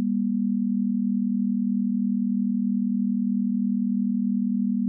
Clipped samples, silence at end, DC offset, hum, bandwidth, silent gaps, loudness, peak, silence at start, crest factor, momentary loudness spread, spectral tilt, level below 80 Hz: under 0.1%; 0 s; under 0.1%; 60 Hz at -25 dBFS; 0.3 kHz; none; -25 LUFS; -18 dBFS; 0 s; 6 dB; 0 LU; -26 dB/octave; under -90 dBFS